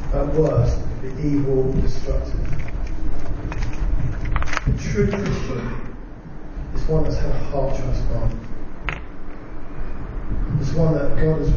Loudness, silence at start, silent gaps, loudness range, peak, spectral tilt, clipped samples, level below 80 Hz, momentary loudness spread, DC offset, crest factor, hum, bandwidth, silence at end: -24 LUFS; 0 s; none; 4 LU; -2 dBFS; -7.5 dB/octave; under 0.1%; -26 dBFS; 15 LU; under 0.1%; 18 dB; none; 7 kHz; 0 s